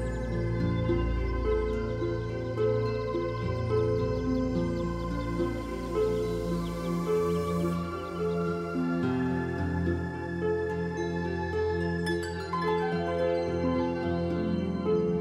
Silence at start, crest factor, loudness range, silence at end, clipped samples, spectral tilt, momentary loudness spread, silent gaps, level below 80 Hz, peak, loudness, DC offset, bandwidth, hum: 0 s; 14 dB; 1 LU; 0 s; under 0.1%; -7.5 dB/octave; 4 LU; none; -40 dBFS; -16 dBFS; -30 LUFS; under 0.1%; 13.5 kHz; none